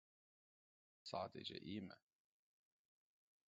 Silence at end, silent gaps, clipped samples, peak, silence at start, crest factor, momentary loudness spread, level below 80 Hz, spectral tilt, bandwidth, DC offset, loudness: 1.5 s; none; under 0.1%; -32 dBFS; 1.05 s; 24 dB; 11 LU; -82 dBFS; -3.5 dB/octave; 7.4 kHz; under 0.1%; -51 LUFS